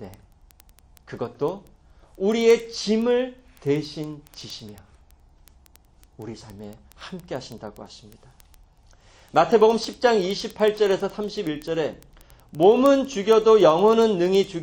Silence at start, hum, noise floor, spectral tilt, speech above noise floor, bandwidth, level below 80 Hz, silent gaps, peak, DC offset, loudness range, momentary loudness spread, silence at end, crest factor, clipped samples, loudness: 0 s; none; -54 dBFS; -5.5 dB/octave; 33 dB; 17 kHz; -54 dBFS; none; -4 dBFS; under 0.1%; 20 LU; 23 LU; 0 s; 20 dB; under 0.1%; -21 LUFS